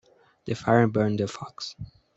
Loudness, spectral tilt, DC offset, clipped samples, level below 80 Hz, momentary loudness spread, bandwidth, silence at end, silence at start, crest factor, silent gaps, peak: -25 LUFS; -6.5 dB/octave; under 0.1%; under 0.1%; -58 dBFS; 18 LU; 8.2 kHz; 0.3 s; 0.45 s; 22 dB; none; -6 dBFS